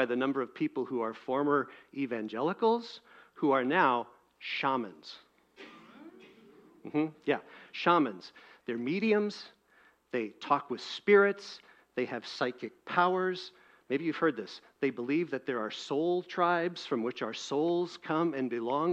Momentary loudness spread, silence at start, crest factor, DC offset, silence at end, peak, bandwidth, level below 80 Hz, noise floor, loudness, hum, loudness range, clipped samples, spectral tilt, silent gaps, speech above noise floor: 19 LU; 0 s; 22 dB; under 0.1%; 0 s; -10 dBFS; 8.4 kHz; -82 dBFS; -65 dBFS; -31 LUFS; none; 4 LU; under 0.1%; -5.5 dB/octave; none; 34 dB